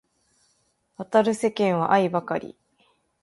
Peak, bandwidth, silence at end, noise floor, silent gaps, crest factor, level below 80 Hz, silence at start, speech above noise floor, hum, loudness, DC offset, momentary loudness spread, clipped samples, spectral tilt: -6 dBFS; 11.5 kHz; 0.75 s; -69 dBFS; none; 20 dB; -68 dBFS; 1 s; 46 dB; none; -23 LUFS; under 0.1%; 13 LU; under 0.1%; -6 dB/octave